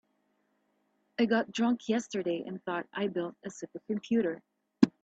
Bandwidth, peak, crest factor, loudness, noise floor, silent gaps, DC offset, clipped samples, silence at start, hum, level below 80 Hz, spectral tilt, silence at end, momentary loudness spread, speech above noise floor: 8 kHz; -6 dBFS; 26 dB; -32 LUFS; -75 dBFS; none; under 0.1%; under 0.1%; 1.2 s; none; -76 dBFS; -5.5 dB/octave; 0.15 s; 14 LU; 43 dB